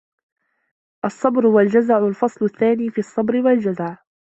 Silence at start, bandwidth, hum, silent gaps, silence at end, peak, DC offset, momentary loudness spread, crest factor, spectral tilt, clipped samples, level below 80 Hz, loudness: 1.05 s; 8.2 kHz; none; none; 0.4 s; -2 dBFS; under 0.1%; 12 LU; 16 dB; -8 dB/octave; under 0.1%; -64 dBFS; -18 LUFS